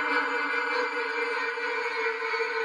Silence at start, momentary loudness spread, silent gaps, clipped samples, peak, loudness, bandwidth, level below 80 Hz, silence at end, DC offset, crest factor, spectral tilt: 0 s; 3 LU; none; under 0.1%; -14 dBFS; -28 LUFS; 11 kHz; under -90 dBFS; 0 s; under 0.1%; 14 dB; -0.5 dB/octave